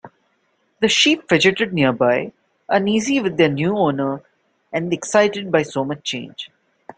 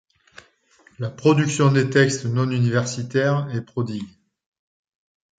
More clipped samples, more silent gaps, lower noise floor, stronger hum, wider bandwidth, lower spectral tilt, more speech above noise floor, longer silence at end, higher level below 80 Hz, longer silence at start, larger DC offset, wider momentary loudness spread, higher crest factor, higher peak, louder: neither; neither; first, -65 dBFS vs -57 dBFS; neither; about the same, 9.4 kHz vs 9.4 kHz; second, -4 dB/octave vs -6 dB/octave; first, 47 dB vs 37 dB; second, 0.5 s vs 1.3 s; about the same, -60 dBFS vs -60 dBFS; second, 0.05 s vs 1 s; neither; about the same, 13 LU vs 13 LU; about the same, 18 dB vs 20 dB; about the same, -2 dBFS vs -2 dBFS; first, -18 LUFS vs -21 LUFS